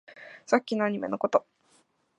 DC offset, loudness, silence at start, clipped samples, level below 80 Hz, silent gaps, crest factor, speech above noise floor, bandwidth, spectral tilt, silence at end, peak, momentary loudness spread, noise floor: under 0.1%; -28 LUFS; 0.1 s; under 0.1%; -78 dBFS; none; 24 dB; 40 dB; 10.5 kHz; -5.5 dB/octave; 0.8 s; -6 dBFS; 15 LU; -66 dBFS